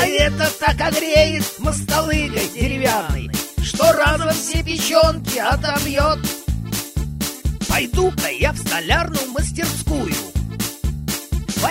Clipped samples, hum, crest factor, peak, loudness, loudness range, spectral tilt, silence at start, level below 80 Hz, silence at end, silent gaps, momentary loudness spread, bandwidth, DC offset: under 0.1%; none; 18 dB; -2 dBFS; -19 LUFS; 3 LU; -4 dB/octave; 0 s; -28 dBFS; 0 s; none; 9 LU; 16.5 kHz; under 0.1%